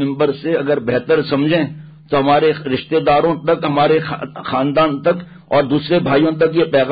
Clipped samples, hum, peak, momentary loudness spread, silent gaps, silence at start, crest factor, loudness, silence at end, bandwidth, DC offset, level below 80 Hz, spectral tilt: under 0.1%; none; -4 dBFS; 6 LU; none; 0 s; 12 dB; -16 LUFS; 0 s; 5 kHz; under 0.1%; -50 dBFS; -12 dB/octave